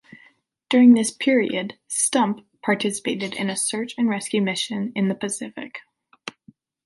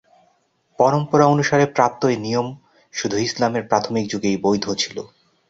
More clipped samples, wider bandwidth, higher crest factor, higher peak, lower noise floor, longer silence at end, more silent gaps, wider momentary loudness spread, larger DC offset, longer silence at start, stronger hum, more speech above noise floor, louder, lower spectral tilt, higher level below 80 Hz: neither; first, 11.5 kHz vs 7.8 kHz; about the same, 18 dB vs 18 dB; about the same, -4 dBFS vs -2 dBFS; second, -57 dBFS vs -63 dBFS; about the same, 0.55 s vs 0.45 s; neither; first, 20 LU vs 10 LU; neither; about the same, 0.7 s vs 0.8 s; neither; second, 36 dB vs 44 dB; about the same, -21 LUFS vs -19 LUFS; about the same, -4 dB/octave vs -5 dB/octave; second, -70 dBFS vs -58 dBFS